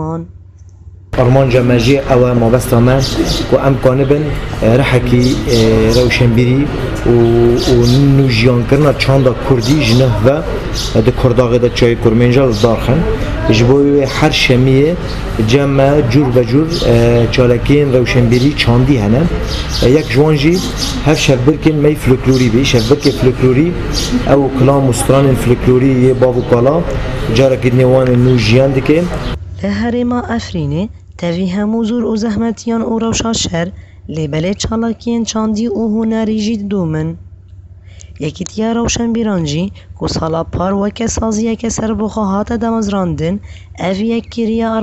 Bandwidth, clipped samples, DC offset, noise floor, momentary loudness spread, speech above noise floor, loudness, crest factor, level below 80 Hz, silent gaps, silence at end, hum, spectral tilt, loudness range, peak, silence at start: 14.5 kHz; under 0.1%; under 0.1%; -35 dBFS; 8 LU; 24 dB; -12 LUFS; 12 dB; -24 dBFS; none; 0 s; none; -6 dB/octave; 6 LU; 0 dBFS; 0 s